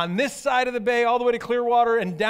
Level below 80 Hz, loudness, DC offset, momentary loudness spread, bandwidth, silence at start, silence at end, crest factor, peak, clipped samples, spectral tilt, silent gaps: -60 dBFS; -22 LUFS; under 0.1%; 4 LU; 15.5 kHz; 0 s; 0 s; 14 dB; -8 dBFS; under 0.1%; -4.5 dB/octave; none